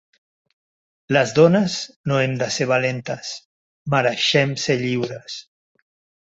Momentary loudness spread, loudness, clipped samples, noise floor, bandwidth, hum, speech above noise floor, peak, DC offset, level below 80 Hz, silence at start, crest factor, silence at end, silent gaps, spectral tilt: 17 LU; -20 LUFS; under 0.1%; under -90 dBFS; 8 kHz; none; over 70 dB; -2 dBFS; under 0.1%; -60 dBFS; 1.1 s; 20 dB; 0.9 s; 1.96-2.04 s, 3.45-3.85 s; -5 dB/octave